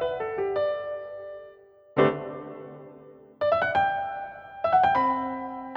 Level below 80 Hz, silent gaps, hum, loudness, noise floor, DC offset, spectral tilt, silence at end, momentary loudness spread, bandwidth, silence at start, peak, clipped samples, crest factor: -60 dBFS; none; none; -26 LUFS; -52 dBFS; under 0.1%; -7.5 dB/octave; 0 s; 20 LU; 6 kHz; 0 s; -8 dBFS; under 0.1%; 20 dB